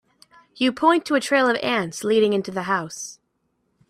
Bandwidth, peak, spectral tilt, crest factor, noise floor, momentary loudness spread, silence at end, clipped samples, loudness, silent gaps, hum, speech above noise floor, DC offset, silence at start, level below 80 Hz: 14.5 kHz; -4 dBFS; -4 dB/octave; 18 dB; -71 dBFS; 9 LU; 0.75 s; under 0.1%; -21 LUFS; none; none; 50 dB; under 0.1%; 0.6 s; -66 dBFS